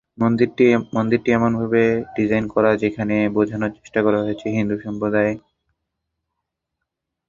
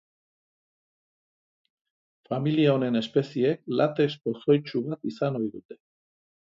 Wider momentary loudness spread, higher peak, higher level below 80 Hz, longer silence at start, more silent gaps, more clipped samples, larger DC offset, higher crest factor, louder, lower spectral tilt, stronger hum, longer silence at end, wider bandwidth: second, 6 LU vs 10 LU; first, -2 dBFS vs -8 dBFS; first, -52 dBFS vs -74 dBFS; second, 0.2 s vs 2.3 s; second, none vs 5.65-5.69 s; neither; neither; about the same, 18 dB vs 20 dB; first, -19 LUFS vs -26 LUFS; about the same, -8 dB/octave vs -8 dB/octave; neither; first, 1.9 s vs 0.75 s; about the same, 7.4 kHz vs 7.6 kHz